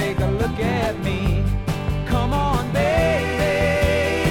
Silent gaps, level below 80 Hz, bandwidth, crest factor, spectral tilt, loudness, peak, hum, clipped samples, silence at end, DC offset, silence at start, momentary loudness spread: none; -28 dBFS; 18 kHz; 14 dB; -6 dB/octave; -21 LUFS; -6 dBFS; none; under 0.1%; 0 s; under 0.1%; 0 s; 5 LU